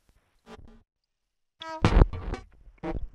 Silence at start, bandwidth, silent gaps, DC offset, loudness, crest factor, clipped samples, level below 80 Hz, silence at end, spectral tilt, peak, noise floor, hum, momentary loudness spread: 0.5 s; 8.8 kHz; none; under 0.1%; -28 LUFS; 26 dB; under 0.1%; -32 dBFS; 0.05 s; -7 dB/octave; -2 dBFS; -79 dBFS; none; 18 LU